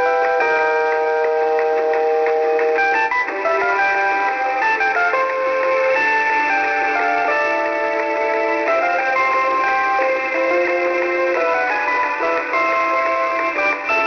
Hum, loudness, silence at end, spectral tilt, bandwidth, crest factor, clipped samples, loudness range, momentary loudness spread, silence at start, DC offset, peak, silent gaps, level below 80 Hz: none; -17 LUFS; 0 s; -3 dB/octave; 6.8 kHz; 10 dB; under 0.1%; 1 LU; 2 LU; 0 s; under 0.1%; -6 dBFS; none; -60 dBFS